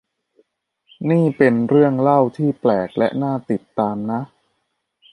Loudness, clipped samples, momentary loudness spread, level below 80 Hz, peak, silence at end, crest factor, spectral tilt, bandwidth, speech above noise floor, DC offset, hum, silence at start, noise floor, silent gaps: -18 LUFS; under 0.1%; 10 LU; -62 dBFS; -2 dBFS; 0.85 s; 18 dB; -9.5 dB/octave; 10.5 kHz; 55 dB; under 0.1%; none; 1 s; -72 dBFS; none